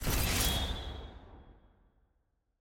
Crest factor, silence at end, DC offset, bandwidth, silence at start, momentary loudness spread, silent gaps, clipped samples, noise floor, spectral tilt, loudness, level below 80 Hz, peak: 22 dB; 1.1 s; under 0.1%; 17 kHz; 0 s; 21 LU; none; under 0.1%; -77 dBFS; -3 dB/octave; -33 LUFS; -40 dBFS; -14 dBFS